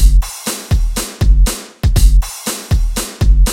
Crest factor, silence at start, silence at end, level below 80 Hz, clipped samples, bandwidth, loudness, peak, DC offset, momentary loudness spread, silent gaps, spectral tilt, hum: 12 dB; 0 s; 0 s; -12 dBFS; 0.2%; 16.5 kHz; -16 LUFS; 0 dBFS; under 0.1%; 7 LU; none; -4.5 dB/octave; none